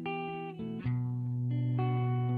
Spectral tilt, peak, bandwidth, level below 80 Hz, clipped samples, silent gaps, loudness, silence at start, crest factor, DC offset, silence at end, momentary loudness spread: -10.5 dB/octave; -22 dBFS; 4 kHz; -64 dBFS; under 0.1%; none; -34 LUFS; 0 s; 12 dB; under 0.1%; 0 s; 8 LU